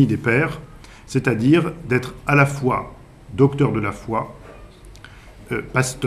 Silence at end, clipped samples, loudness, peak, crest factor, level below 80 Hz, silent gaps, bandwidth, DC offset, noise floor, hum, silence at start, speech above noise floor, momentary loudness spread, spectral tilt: 0 s; under 0.1%; -20 LUFS; -2 dBFS; 20 dB; -44 dBFS; none; 14 kHz; under 0.1%; -42 dBFS; none; 0 s; 23 dB; 12 LU; -6.5 dB/octave